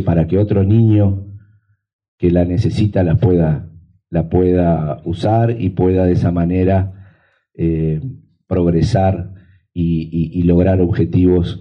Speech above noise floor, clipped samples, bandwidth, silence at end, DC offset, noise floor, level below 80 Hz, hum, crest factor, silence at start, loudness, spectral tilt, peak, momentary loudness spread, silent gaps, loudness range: 40 dB; under 0.1%; 7.6 kHz; 0 s; under 0.1%; -54 dBFS; -34 dBFS; none; 12 dB; 0 s; -15 LUFS; -9.5 dB/octave; -2 dBFS; 9 LU; 1.93-1.99 s, 2.08-2.18 s; 3 LU